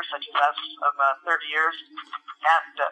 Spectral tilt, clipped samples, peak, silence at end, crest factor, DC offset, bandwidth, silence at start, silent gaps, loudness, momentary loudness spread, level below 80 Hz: 1 dB/octave; under 0.1%; -8 dBFS; 0 s; 18 dB; under 0.1%; 9.2 kHz; 0 s; none; -23 LUFS; 15 LU; under -90 dBFS